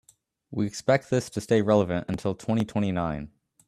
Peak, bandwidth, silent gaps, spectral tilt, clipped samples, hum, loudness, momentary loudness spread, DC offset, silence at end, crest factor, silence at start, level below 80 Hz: -6 dBFS; 13.5 kHz; none; -6.5 dB/octave; under 0.1%; none; -26 LUFS; 9 LU; under 0.1%; 0.4 s; 20 dB; 0.5 s; -54 dBFS